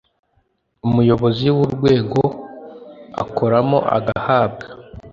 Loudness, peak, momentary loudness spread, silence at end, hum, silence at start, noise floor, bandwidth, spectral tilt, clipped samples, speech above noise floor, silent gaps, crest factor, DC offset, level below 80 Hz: -17 LUFS; -2 dBFS; 20 LU; 0.05 s; none; 0.85 s; -64 dBFS; 7.4 kHz; -8.5 dB/octave; under 0.1%; 48 dB; none; 16 dB; under 0.1%; -46 dBFS